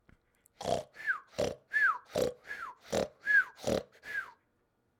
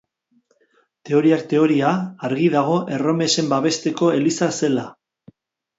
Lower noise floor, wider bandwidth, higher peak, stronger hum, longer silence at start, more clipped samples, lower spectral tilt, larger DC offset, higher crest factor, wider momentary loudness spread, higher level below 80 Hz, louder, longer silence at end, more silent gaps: first, -76 dBFS vs -63 dBFS; first, 18.5 kHz vs 8 kHz; second, -16 dBFS vs -4 dBFS; neither; second, 0.6 s vs 1.05 s; neither; second, -3.5 dB/octave vs -5 dB/octave; neither; about the same, 18 dB vs 16 dB; first, 14 LU vs 5 LU; about the same, -62 dBFS vs -66 dBFS; second, -33 LUFS vs -19 LUFS; second, 0.7 s vs 0.85 s; neither